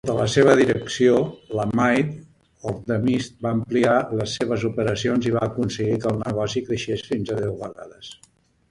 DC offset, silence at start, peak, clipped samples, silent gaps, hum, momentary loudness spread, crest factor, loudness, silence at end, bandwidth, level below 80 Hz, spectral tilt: under 0.1%; 0.05 s; -2 dBFS; under 0.1%; none; none; 14 LU; 20 dB; -22 LUFS; 0.55 s; 11.5 kHz; -52 dBFS; -6 dB/octave